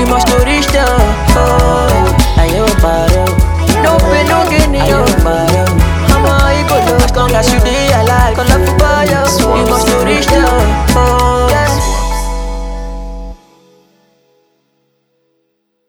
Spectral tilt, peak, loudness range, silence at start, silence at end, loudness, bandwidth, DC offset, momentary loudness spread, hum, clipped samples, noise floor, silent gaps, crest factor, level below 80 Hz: -5 dB/octave; 0 dBFS; 7 LU; 0 s; 2.55 s; -10 LUFS; over 20 kHz; under 0.1%; 6 LU; none; 0.2%; -63 dBFS; none; 10 dB; -16 dBFS